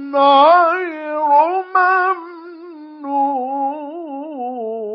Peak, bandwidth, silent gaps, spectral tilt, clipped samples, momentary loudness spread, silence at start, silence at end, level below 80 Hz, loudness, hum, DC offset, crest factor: -2 dBFS; 5.6 kHz; none; -5.5 dB/octave; under 0.1%; 23 LU; 0 s; 0 s; under -90 dBFS; -15 LUFS; none; under 0.1%; 16 dB